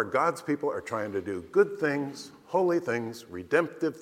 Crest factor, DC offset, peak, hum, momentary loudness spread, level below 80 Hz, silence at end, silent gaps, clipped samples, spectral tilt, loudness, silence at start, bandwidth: 20 dB; under 0.1%; -10 dBFS; none; 10 LU; -70 dBFS; 0 s; none; under 0.1%; -6 dB/octave; -29 LUFS; 0 s; 16 kHz